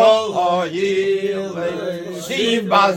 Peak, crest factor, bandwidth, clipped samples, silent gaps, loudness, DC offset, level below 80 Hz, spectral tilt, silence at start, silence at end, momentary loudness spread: 0 dBFS; 18 dB; 17 kHz; under 0.1%; none; -19 LUFS; under 0.1%; -62 dBFS; -4.5 dB/octave; 0 s; 0 s; 10 LU